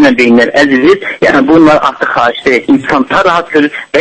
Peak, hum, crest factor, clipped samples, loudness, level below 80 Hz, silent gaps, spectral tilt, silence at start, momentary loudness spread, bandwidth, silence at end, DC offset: 0 dBFS; none; 8 dB; 2%; -8 LUFS; -40 dBFS; none; -5.5 dB/octave; 0 s; 5 LU; 11 kHz; 0 s; under 0.1%